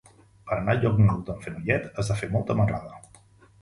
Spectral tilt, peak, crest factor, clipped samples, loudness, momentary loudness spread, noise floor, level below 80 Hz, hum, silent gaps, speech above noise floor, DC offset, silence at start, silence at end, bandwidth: -7.5 dB/octave; -8 dBFS; 18 dB; under 0.1%; -26 LUFS; 12 LU; -55 dBFS; -46 dBFS; none; none; 30 dB; under 0.1%; 0.45 s; 0.65 s; 11.5 kHz